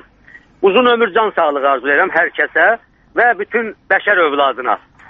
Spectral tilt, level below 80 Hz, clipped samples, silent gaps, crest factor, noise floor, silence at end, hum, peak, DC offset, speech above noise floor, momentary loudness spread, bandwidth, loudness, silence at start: -0.5 dB/octave; -56 dBFS; under 0.1%; none; 14 dB; -44 dBFS; 0.3 s; none; 0 dBFS; under 0.1%; 30 dB; 8 LU; 4.9 kHz; -14 LUFS; 0.6 s